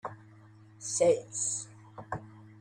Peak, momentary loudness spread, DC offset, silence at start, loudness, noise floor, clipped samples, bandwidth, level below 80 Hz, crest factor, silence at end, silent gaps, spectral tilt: -14 dBFS; 21 LU; under 0.1%; 0.05 s; -31 LUFS; -55 dBFS; under 0.1%; 10.5 kHz; -70 dBFS; 20 dB; 0 s; none; -3.5 dB/octave